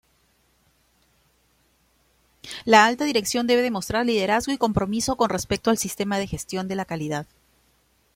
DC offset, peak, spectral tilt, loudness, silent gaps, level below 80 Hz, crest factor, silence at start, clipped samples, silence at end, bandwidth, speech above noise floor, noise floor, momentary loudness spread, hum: under 0.1%; -2 dBFS; -4 dB/octave; -22 LUFS; none; -52 dBFS; 24 dB; 2.45 s; under 0.1%; 0.9 s; 16.5 kHz; 42 dB; -64 dBFS; 13 LU; none